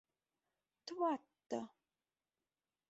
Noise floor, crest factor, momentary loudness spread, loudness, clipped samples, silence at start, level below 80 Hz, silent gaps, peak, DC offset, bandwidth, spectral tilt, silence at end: under -90 dBFS; 20 dB; 16 LU; -43 LUFS; under 0.1%; 0.85 s; under -90 dBFS; none; -26 dBFS; under 0.1%; 8 kHz; -3.5 dB/octave; 1.2 s